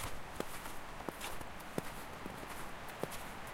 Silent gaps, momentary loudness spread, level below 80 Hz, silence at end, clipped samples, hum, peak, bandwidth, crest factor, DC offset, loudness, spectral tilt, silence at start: none; 3 LU; -54 dBFS; 0 s; under 0.1%; none; -18 dBFS; 16.5 kHz; 26 dB; under 0.1%; -45 LUFS; -3.5 dB/octave; 0 s